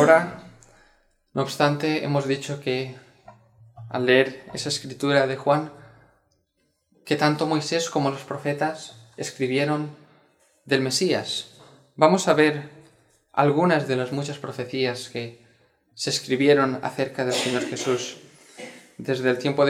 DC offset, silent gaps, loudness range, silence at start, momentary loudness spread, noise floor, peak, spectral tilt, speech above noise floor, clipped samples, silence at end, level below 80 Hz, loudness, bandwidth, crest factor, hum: under 0.1%; none; 4 LU; 0 s; 15 LU; -71 dBFS; -2 dBFS; -4.5 dB/octave; 48 dB; under 0.1%; 0 s; -68 dBFS; -24 LUFS; 15.5 kHz; 22 dB; none